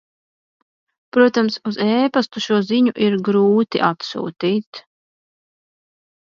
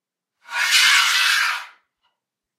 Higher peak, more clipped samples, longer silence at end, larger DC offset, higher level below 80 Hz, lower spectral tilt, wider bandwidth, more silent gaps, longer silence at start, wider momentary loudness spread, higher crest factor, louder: about the same, 0 dBFS vs -2 dBFS; neither; first, 1.4 s vs 0.9 s; neither; first, -68 dBFS vs -82 dBFS; first, -6 dB/octave vs 6 dB/octave; second, 7.4 kHz vs 16 kHz; first, 4.67-4.73 s vs none; first, 1.15 s vs 0.5 s; second, 9 LU vs 14 LU; about the same, 20 dB vs 18 dB; second, -18 LUFS vs -15 LUFS